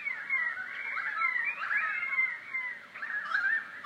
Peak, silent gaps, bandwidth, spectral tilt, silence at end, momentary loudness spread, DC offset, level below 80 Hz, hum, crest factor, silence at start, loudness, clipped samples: -18 dBFS; none; 13.5 kHz; -1.5 dB/octave; 0 s; 7 LU; under 0.1%; under -90 dBFS; none; 16 dB; 0 s; -31 LUFS; under 0.1%